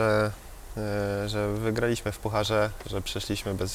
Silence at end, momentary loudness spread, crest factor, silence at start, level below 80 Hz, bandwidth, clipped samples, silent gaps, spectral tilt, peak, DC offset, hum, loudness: 0 s; 7 LU; 16 dB; 0 s; -44 dBFS; 16.5 kHz; under 0.1%; none; -5 dB/octave; -12 dBFS; under 0.1%; none; -29 LUFS